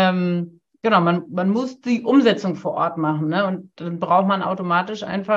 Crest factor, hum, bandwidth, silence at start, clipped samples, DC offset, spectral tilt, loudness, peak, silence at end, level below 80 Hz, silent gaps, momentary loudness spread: 18 dB; none; 7.6 kHz; 0 s; under 0.1%; under 0.1%; -7 dB/octave; -20 LUFS; -2 dBFS; 0 s; -68 dBFS; none; 10 LU